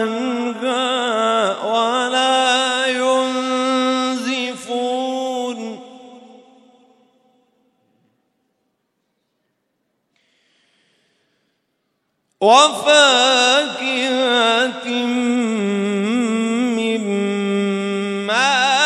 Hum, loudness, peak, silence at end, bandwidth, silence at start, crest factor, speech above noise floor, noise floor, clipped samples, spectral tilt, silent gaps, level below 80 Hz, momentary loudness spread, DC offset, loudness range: none; -17 LUFS; 0 dBFS; 0 s; 12 kHz; 0 s; 20 dB; 57 dB; -71 dBFS; under 0.1%; -3 dB/octave; none; -74 dBFS; 10 LU; under 0.1%; 12 LU